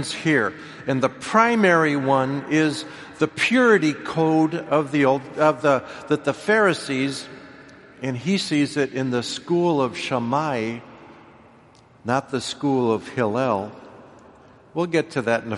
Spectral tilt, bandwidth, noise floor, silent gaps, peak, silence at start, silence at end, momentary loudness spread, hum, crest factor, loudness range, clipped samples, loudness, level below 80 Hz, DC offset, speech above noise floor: -5.5 dB/octave; 11.5 kHz; -51 dBFS; none; -2 dBFS; 0 s; 0 s; 11 LU; none; 20 dB; 6 LU; under 0.1%; -21 LUFS; -64 dBFS; under 0.1%; 30 dB